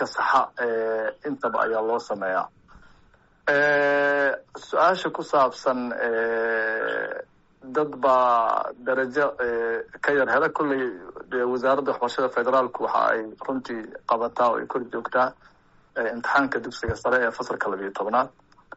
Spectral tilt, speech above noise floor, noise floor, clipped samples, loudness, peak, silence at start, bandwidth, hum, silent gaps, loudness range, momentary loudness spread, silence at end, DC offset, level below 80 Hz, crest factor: -2.5 dB/octave; 34 dB; -57 dBFS; under 0.1%; -24 LUFS; -10 dBFS; 0 s; 8 kHz; none; none; 3 LU; 9 LU; 0.45 s; under 0.1%; -56 dBFS; 14 dB